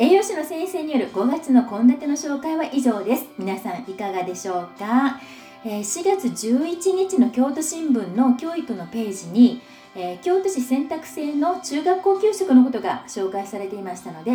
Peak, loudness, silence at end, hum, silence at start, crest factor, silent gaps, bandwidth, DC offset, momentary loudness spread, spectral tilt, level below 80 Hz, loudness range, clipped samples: -4 dBFS; -22 LUFS; 0 s; none; 0 s; 18 dB; none; over 20 kHz; under 0.1%; 13 LU; -4.5 dB/octave; -70 dBFS; 4 LU; under 0.1%